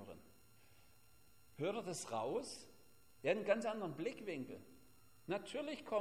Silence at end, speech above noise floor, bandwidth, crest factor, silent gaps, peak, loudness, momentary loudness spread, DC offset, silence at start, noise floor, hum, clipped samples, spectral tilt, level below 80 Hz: 0 s; 28 dB; 16 kHz; 22 dB; none; -22 dBFS; -43 LUFS; 20 LU; under 0.1%; 0 s; -70 dBFS; none; under 0.1%; -4.5 dB/octave; -78 dBFS